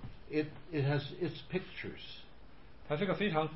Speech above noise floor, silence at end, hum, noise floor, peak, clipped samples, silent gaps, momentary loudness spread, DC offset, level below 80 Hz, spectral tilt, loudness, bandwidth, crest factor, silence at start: 21 dB; 0 s; none; -57 dBFS; -18 dBFS; under 0.1%; none; 13 LU; 0.3%; -58 dBFS; -5 dB/octave; -37 LUFS; 5.8 kHz; 20 dB; 0 s